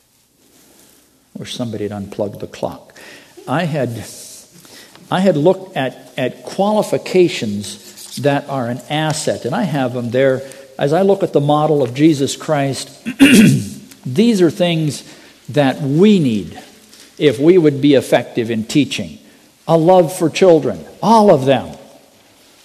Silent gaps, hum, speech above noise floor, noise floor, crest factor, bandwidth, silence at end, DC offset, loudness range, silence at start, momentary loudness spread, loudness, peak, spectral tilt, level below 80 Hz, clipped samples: none; none; 40 dB; -55 dBFS; 16 dB; 14 kHz; 0.8 s; under 0.1%; 10 LU; 1.4 s; 16 LU; -15 LUFS; 0 dBFS; -6 dB/octave; -56 dBFS; under 0.1%